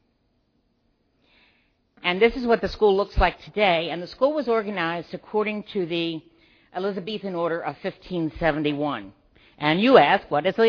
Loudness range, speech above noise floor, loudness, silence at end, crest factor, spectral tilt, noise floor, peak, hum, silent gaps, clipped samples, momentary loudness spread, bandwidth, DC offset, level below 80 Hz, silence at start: 6 LU; 46 dB; -23 LUFS; 0 s; 22 dB; -7 dB/octave; -68 dBFS; -2 dBFS; none; none; under 0.1%; 11 LU; 5.4 kHz; under 0.1%; -40 dBFS; 2.05 s